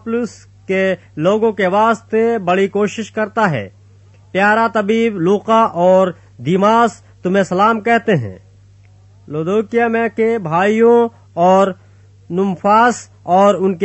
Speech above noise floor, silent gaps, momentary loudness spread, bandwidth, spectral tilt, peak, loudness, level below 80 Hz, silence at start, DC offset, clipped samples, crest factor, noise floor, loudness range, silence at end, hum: 31 dB; none; 10 LU; 8.4 kHz; -6.5 dB/octave; -2 dBFS; -15 LUFS; -58 dBFS; 0.05 s; under 0.1%; under 0.1%; 14 dB; -45 dBFS; 3 LU; 0 s; none